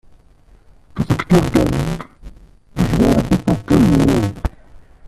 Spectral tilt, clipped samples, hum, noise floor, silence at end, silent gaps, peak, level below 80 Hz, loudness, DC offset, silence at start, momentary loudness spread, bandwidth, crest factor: -7 dB/octave; under 0.1%; none; -48 dBFS; 0.3 s; none; 0 dBFS; -30 dBFS; -16 LUFS; under 0.1%; 0.95 s; 15 LU; 14 kHz; 16 dB